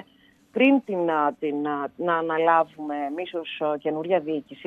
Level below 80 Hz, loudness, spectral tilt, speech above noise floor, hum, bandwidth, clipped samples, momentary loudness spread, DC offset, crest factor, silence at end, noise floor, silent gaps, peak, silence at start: -74 dBFS; -24 LUFS; -7.5 dB/octave; 34 dB; none; 4.1 kHz; under 0.1%; 11 LU; under 0.1%; 18 dB; 0 s; -58 dBFS; none; -6 dBFS; 0.55 s